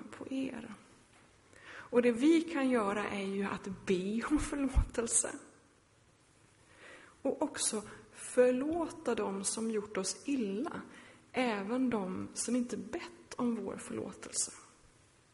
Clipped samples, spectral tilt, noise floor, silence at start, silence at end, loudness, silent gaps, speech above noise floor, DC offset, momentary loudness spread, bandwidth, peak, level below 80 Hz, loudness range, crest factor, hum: under 0.1%; -4 dB/octave; -66 dBFS; 0 s; 0.7 s; -34 LUFS; none; 33 dB; under 0.1%; 17 LU; 11.5 kHz; -16 dBFS; -48 dBFS; 4 LU; 20 dB; none